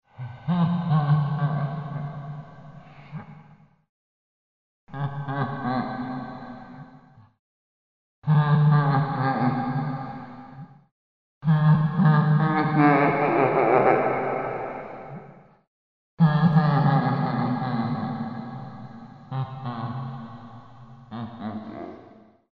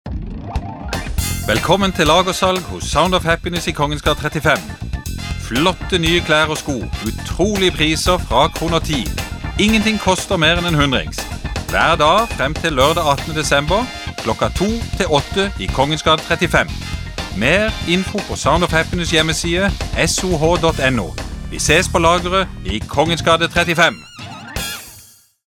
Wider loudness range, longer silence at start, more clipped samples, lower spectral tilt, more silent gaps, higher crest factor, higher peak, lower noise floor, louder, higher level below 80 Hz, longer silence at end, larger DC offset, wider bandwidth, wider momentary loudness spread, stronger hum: first, 15 LU vs 2 LU; first, 0.2 s vs 0.05 s; neither; first, -10.5 dB/octave vs -4 dB/octave; first, 3.89-4.87 s, 7.39-8.22 s, 10.91-11.41 s, 15.67-16.17 s vs none; about the same, 20 dB vs 16 dB; second, -6 dBFS vs 0 dBFS; first, -53 dBFS vs -45 dBFS; second, -23 LUFS vs -16 LUFS; second, -62 dBFS vs -28 dBFS; about the same, 0.45 s vs 0.45 s; first, 0.2% vs under 0.1%; second, 4.9 kHz vs 19 kHz; first, 22 LU vs 12 LU; neither